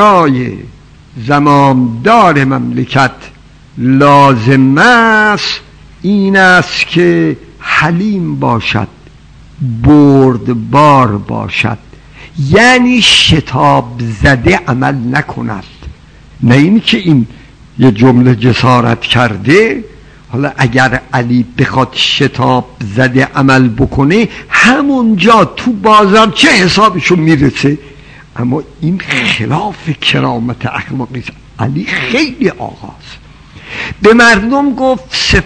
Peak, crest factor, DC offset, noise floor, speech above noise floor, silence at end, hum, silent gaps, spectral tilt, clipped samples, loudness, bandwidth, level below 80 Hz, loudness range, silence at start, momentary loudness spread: 0 dBFS; 10 dB; under 0.1%; -36 dBFS; 27 dB; 0 s; none; none; -5.5 dB/octave; 3%; -9 LUFS; 11 kHz; -32 dBFS; 6 LU; 0 s; 14 LU